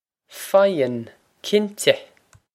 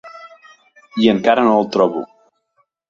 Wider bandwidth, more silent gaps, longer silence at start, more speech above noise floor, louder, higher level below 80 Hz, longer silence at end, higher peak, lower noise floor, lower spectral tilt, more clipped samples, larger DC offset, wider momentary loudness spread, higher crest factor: first, 16 kHz vs 7.2 kHz; neither; first, 0.3 s vs 0.05 s; second, 20 dB vs 50 dB; second, -20 LUFS vs -15 LUFS; second, -72 dBFS vs -58 dBFS; second, 0.5 s vs 0.85 s; about the same, 0 dBFS vs 0 dBFS; second, -40 dBFS vs -65 dBFS; second, -4 dB/octave vs -6.5 dB/octave; neither; neither; about the same, 17 LU vs 19 LU; about the same, 22 dB vs 18 dB